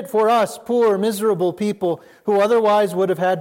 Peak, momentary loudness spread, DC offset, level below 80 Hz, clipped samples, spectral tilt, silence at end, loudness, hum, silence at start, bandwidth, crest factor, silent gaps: -6 dBFS; 7 LU; under 0.1%; -70 dBFS; under 0.1%; -5.5 dB/octave; 0 s; -18 LUFS; none; 0 s; 16.5 kHz; 10 dB; none